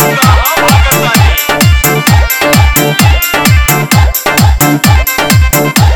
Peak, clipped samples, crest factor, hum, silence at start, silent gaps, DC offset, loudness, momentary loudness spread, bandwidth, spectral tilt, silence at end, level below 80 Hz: 0 dBFS; 2%; 6 dB; none; 0 s; none; under 0.1%; -7 LUFS; 1 LU; over 20 kHz; -4 dB/octave; 0 s; -14 dBFS